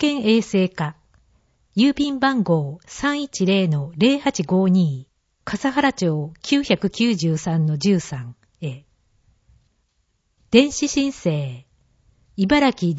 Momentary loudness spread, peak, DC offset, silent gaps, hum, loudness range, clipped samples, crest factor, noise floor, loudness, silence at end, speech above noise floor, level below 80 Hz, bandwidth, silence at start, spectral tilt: 15 LU; -2 dBFS; under 0.1%; none; none; 4 LU; under 0.1%; 20 dB; -68 dBFS; -20 LUFS; 0 s; 49 dB; -52 dBFS; 8 kHz; 0 s; -5.5 dB/octave